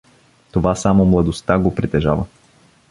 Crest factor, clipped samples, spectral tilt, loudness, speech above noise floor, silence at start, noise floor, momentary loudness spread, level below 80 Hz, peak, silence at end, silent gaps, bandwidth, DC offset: 16 dB; under 0.1%; -7 dB/octave; -17 LUFS; 37 dB; 0.55 s; -52 dBFS; 9 LU; -34 dBFS; 0 dBFS; 0.65 s; none; 11.5 kHz; under 0.1%